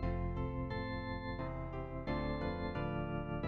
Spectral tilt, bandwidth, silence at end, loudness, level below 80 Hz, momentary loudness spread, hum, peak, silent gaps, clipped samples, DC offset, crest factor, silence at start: -9 dB/octave; 6.2 kHz; 0 s; -40 LUFS; -46 dBFS; 4 LU; none; -26 dBFS; none; under 0.1%; under 0.1%; 14 dB; 0 s